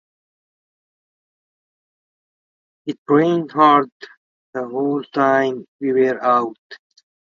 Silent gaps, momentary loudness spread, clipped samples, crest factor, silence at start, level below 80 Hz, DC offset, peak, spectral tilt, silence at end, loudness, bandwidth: 2.98-3.06 s, 3.92-4.00 s, 4.17-4.53 s, 5.68-5.79 s, 6.58-6.70 s; 17 LU; under 0.1%; 20 dB; 2.85 s; -74 dBFS; under 0.1%; 0 dBFS; -7 dB/octave; 0.6 s; -17 LUFS; 7.2 kHz